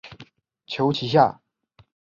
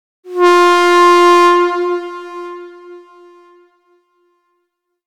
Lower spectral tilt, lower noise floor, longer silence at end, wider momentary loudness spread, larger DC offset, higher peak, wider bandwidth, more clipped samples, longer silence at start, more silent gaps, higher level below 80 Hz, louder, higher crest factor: first, -7 dB/octave vs -1.5 dB/octave; second, -59 dBFS vs -70 dBFS; second, 0.8 s vs 2.1 s; second, 16 LU vs 20 LU; neither; second, -4 dBFS vs 0 dBFS; second, 7.4 kHz vs 13.5 kHz; neither; second, 0.05 s vs 0.25 s; neither; first, -62 dBFS vs -72 dBFS; second, -22 LUFS vs -10 LUFS; first, 22 dB vs 12 dB